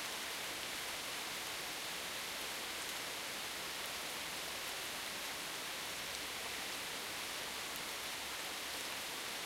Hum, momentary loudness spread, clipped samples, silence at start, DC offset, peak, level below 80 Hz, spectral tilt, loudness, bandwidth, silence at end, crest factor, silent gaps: none; 1 LU; under 0.1%; 0 s; under 0.1%; -24 dBFS; -70 dBFS; 0 dB/octave; -41 LUFS; 16 kHz; 0 s; 18 dB; none